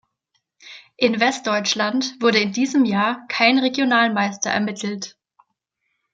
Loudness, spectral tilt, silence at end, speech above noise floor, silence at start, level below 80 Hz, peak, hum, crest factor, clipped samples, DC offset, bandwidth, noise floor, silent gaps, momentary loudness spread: -19 LUFS; -3.5 dB/octave; 1.05 s; 55 dB; 0.65 s; -70 dBFS; -2 dBFS; none; 20 dB; under 0.1%; under 0.1%; 8.8 kHz; -75 dBFS; none; 8 LU